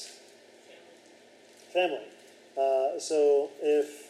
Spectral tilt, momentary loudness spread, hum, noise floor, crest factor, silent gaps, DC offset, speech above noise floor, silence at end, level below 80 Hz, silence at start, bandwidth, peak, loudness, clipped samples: -2.5 dB/octave; 16 LU; none; -56 dBFS; 14 dB; none; under 0.1%; 29 dB; 0 s; under -90 dBFS; 0 s; 12.5 kHz; -16 dBFS; -28 LUFS; under 0.1%